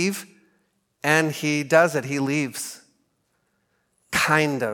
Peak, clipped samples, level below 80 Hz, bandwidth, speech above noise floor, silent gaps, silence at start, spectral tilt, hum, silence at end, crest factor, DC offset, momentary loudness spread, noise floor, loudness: -2 dBFS; under 0.1%; -64 dBFS; 17.5 kHz; 49 dB; none; 0 s; -4.5 dB/octave; none; 0 s; 22 dB; under 0.1%; 12 LU; -71 dBFS; -22 LUFS